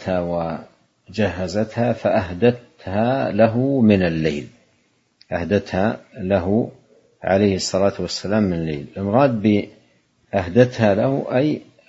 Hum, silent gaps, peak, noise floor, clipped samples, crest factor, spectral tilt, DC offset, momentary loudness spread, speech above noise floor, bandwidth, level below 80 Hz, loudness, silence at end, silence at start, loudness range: none; none; 0 dBFS; -63 dBFS; under 0.1%; 20 dB; -6.5 dB/octave; under 0.1%; 11 LU; 44 dB; 8 kHz; -48 dBFS; -20 LUFS; 0.25 s; 0 s; 3 LU